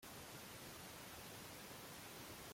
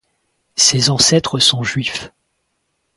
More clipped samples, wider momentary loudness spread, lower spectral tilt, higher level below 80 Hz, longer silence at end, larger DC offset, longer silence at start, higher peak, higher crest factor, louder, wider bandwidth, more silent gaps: neither; second, 0 LU vs 12 LU; about the same, -3 dB/octave vs -2.5 dB/octave; second, -74 dBFS vs -50 dBFS; second, 0 s vs 0.9 s; neither; second, 0 s vs 0.55 s; second, -42 dBFS vs 0 dBFS; about the same, 14 dB vs 18 dB; second, -54 LUFS vs -13 LUFS; first, 16.5 kHz vs 11.5 kHz; neither